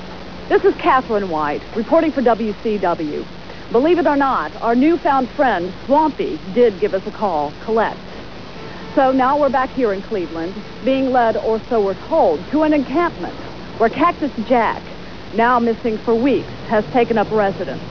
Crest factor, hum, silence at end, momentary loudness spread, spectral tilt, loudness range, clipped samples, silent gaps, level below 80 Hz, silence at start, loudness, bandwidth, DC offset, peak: 14 dB; none; 0 s; 13 LU; -7 dB/octave; 2 LU; under 0.1%; none; -44 dBFS; 0 s; -18 LUFS; 5.4 kHz; 1%; -2 dBFS